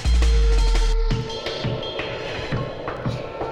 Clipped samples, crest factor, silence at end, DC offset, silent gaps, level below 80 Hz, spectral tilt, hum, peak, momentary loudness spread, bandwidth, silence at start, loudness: under 0.1%; 12 dB; 0 s; under 0.1%; none; -22 dBFS; -5.5 dB/octave; none; -8 dBFS; 9 LU; 10 kHz; 0 s; -24 LUFS